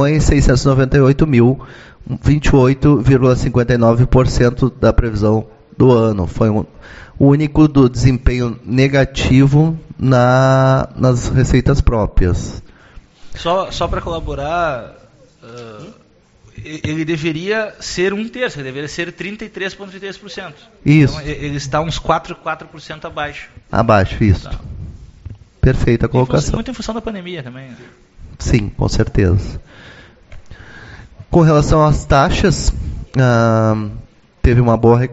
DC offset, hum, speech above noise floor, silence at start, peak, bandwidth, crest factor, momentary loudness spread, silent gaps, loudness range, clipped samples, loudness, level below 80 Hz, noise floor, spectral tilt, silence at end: under 0.1%; none; 35 dB; 0 s; 0 dBFS; 8 kHz; 14 dB; 17 LU; none; 9 LU; under 0.1%; -15 LUFS; -26 dBFS; -49 dBFS; -7 dB/octave; 0 s